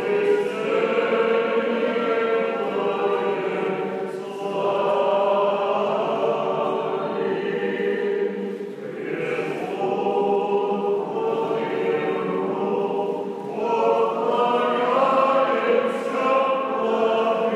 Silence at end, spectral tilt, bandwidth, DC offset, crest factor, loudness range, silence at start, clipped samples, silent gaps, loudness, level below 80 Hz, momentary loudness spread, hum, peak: 0 s; -6 dB/octave; 11 kHz; under 0.1%; 16 dB; 4 LU; 0 s; under 0.1%; none; -23 LUFS; -82 dBFS; 7 LU; none; -8 dBFS